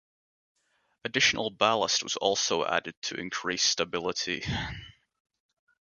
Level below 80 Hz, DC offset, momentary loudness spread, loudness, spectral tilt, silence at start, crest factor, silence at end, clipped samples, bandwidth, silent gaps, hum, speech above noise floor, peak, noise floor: -56 dBFS; under 0.1%; 11 LU; -27 LUFS; -2 dB/octave; 1.05 s; 24 dB; 1.05 s; under 0.1%; 10.5 kHz; 2.97-3.02 s; none; 39 dB; -6 dBFS; -68 dBFS